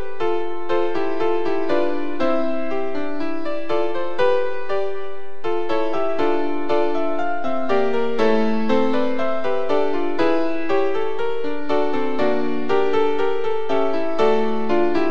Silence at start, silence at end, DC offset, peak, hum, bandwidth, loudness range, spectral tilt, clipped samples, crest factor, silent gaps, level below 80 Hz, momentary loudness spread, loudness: 0 s; 0 s; 10%; -4 dBFS; none; 8 kHz; 3 LU; -6.5 dB/octave; under 0.1%; 16 dB; none; -60 dBFS; 6 LU; -22 LUFS